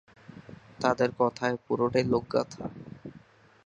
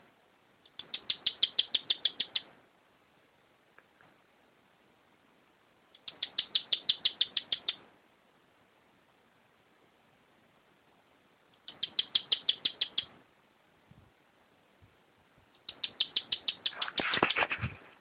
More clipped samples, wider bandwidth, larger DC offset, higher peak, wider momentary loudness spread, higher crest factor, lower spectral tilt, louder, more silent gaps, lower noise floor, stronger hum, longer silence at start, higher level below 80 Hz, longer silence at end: neither; second, 9.6 kHz vs 13.5 kHz; neither; about the same, -8 dBFS vs -6 dBFS; about the same, 22 LU vs 20 LU; second, 22 dB vs 32 dB; first, -6 dB/octave vs -4.5 dB/octave; first, -28 LUFS vs -33 LUFS; neither; second, -56 dBFS vs -67 dBFS; neither; second, 0.3 s vs 0.8 s; first, -62 dBFS vs -70 dBFS; first, 0.5 s vs 0.1 s